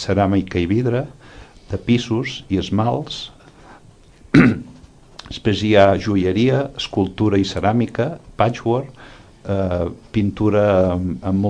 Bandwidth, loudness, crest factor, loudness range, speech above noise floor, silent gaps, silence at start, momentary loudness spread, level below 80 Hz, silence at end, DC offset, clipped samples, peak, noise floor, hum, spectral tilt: 10 kHz; -19 LUFS; 18 dB; 4 LU; 28 dB; none; 0 s; 13 LU; -42 dBFS; 0 s; under 0.1%; under 0.1%; 0 dBFS; -46 dBFS; none; -7 dB/octave